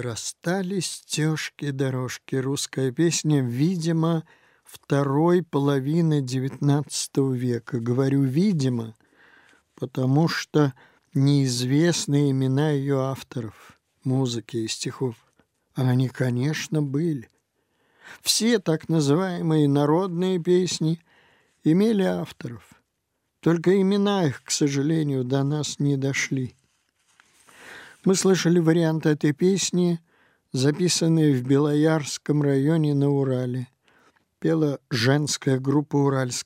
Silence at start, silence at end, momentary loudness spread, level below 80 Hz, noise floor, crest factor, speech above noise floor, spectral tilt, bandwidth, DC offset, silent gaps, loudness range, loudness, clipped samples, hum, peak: 0 s; 0.05 s; 10 LU; -70 dBFS; -76 dBFS; 18 dB; 54 dB; -5.5 dB/octave; 16 kHz; under 0.1%; none; 4 LU; -23 LUFS; under 0.1%; none; -6 dBFS